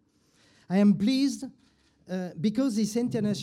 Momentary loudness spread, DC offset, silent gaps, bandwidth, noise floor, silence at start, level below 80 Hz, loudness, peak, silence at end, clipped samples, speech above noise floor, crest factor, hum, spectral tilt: 14 LU; under 0.1%; none; 13.5 kHz; -64 dBFS; 0.7 s; -66 dBFS; -27 LUFS; -12 dBFS; 0 s; under 0.1%; 39 dB; 14 dB; none; -6 dB/octave